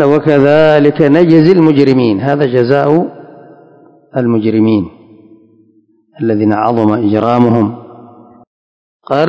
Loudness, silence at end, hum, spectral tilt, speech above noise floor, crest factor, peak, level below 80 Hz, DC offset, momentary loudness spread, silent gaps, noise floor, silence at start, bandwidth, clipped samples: -10 LUFS; 0 s; none; -9 dB/octave; 42 dB; 12 dB; 0 dBFS; -48 dBFS; under 0.1%; 10 LU; 8.47-9.00 s; -51 dBFS; 0 s; 8 kHz; 1%